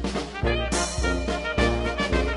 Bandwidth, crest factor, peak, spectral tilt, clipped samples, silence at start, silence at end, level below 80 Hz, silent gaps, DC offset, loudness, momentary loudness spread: 11.5 kHz; 16 dB; -8 dBFS; -4.5 dB/octave; under 0.1%; 0 s; 0 s; -30 dBFS; none; under 0.1%; -25 LUFS; 3 LU